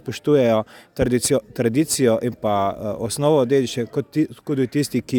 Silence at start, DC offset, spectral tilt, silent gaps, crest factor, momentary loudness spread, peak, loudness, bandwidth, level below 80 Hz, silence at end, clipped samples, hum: 0.05 s; under 0.1%; -5.5 dB/octave; none; 16 dB; 7 LU; -4 dBFS; -20 LUFS; 17.5 kHz; -48 dBFS; 0 s; under 0.1%; none